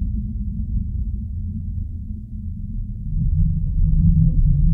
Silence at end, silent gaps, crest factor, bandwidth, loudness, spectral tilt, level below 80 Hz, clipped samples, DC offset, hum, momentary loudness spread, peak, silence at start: 0 s; none; 16 dB; 0.6 kHz; -23 LUFS; -14 dB/octave; -22 dBFS; under 0.1%; under 0.1%; none; 13 LU; -4 dBFS; 0 s